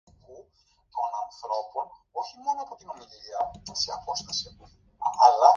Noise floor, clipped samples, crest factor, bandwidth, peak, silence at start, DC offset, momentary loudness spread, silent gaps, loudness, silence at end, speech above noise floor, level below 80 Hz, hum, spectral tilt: -65 dBFS; under 0.1%; 24 dB; 7.4 kHz; -4 dBFS; 0.3 s; under 0.1%; 18 LU; none; -28 LUFS; 0 s; 39 dB; -62 dBFS; none; -1.5 dB/octave